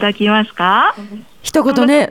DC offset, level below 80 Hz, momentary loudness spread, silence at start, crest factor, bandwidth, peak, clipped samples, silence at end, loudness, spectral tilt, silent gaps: under 0.1%; -52 dBFS; 16 LU; 0 s; 14 dB; 17.5 kHz; 0 dBFS; under 0.1%; 0 s; -13 LUFS; -4.5 dB/octave; none